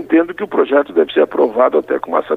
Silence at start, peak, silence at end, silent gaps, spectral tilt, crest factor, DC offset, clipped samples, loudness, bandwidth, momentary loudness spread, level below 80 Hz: 0 s; 0 dBFS; 0 s; none; -7 dB/octave; 14 dB; under 0.1%; under 0.1%; -15 LUFS; 4.1 kHz; 4 LU; -58 dBFS